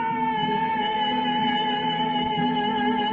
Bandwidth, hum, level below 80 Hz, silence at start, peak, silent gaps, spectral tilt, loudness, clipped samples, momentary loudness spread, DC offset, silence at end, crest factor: 4.9 kHz; none; -58 dBFS; 0 s; -12 dBFS; none; -7 dB/octave; -24 LUFS; under 0.1%; 1 LU; under 0.1%; 0 s; 12 dB